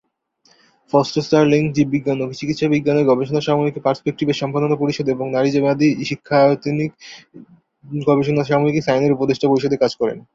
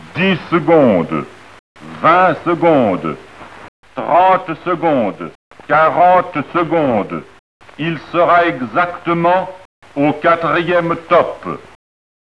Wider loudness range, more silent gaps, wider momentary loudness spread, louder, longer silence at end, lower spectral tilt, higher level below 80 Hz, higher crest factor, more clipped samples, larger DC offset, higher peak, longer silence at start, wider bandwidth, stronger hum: about the same, 1 LU vs 2 LU; second, none vs 1.59-1.75 s, 3.68-3.83 s, 5.35-5.51 s, 7.39-7.60 s, 9.65-9.82 s; second, 7 LU vs 16 LU; second, -18 LUFS vs -14 LUFS; second, 0.15 s vs 0.75 s; about the same, -7 dB/octave vs -7.5 dB/octave; about the same, -56 dBFS vs -54 dBFS; about the same, 16 dB vs 14 dB; neither; second, under 0.1% vs 0.4%; about the same, -2 dBFS vs 0 dBFS; first, 0.95 s vs 0 s; second, 7.6 kHz vs 11 kHz; neither